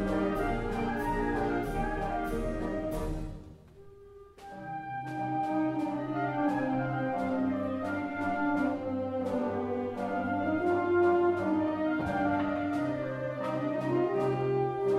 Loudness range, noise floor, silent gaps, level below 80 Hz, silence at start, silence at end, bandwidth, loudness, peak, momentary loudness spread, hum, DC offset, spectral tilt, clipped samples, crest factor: 7 LU; -52 dBFS; none; -46 dBFS; 0 s; 0 s; 13.5 kHz; -31 LUFS; -16 dBFS; 6 LU; none; under 0.1%; -8 dB/octave; under 0.1%; 16 dB